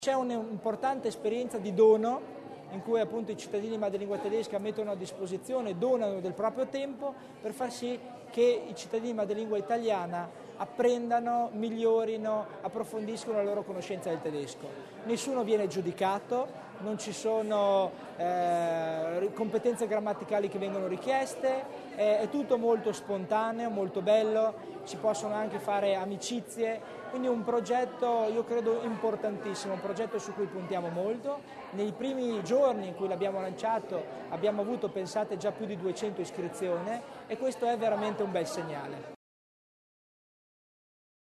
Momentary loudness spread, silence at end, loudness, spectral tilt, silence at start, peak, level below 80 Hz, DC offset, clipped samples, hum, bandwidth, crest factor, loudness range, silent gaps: 10 LU; 2.25 s; -32 LUFS; -5 dB/octave; 0 s; -12 dBFS; -76 dBFS; under 0.1%; under 0.1%; none; 13 kHz; 18 dB; 4 LU; none